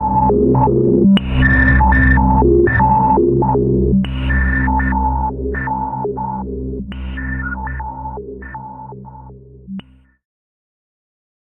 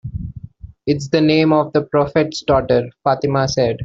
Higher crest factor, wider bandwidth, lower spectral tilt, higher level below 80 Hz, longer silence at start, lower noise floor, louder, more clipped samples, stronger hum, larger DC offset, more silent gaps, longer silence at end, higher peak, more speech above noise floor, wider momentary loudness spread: about the same, 14 dB vs 16 dB; second, 4 kHz vs 7.8 kHz; first, -10.5 dB/octave vs -6.5 dB/octave; first, -22 dBFS vs -40 dBFS; about the same, 0 s vs 0.05 s; about the same, -37 dBFS vs -36 dBFS; about the same, -15 LUFS vs -17 LUFS; neither; neither; neither; neither; first, 1.65 s vs 0 s; about the same, -2 dBFS vs -2 dBFS; first, 25 dB vs 20 dB; first, 19 LU vs 15 LU